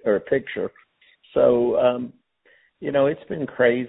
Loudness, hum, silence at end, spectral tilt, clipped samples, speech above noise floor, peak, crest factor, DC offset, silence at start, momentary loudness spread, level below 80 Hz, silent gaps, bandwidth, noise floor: -22 LUFS; none; 0 s; -10.5 dB/octave; under 0.1%; 39 dB; -6 dBFS; 18 dB; under 0.1%; 0.05 s; 13 LU; -58 dBFS; none; 4 kHz; -60 dBFS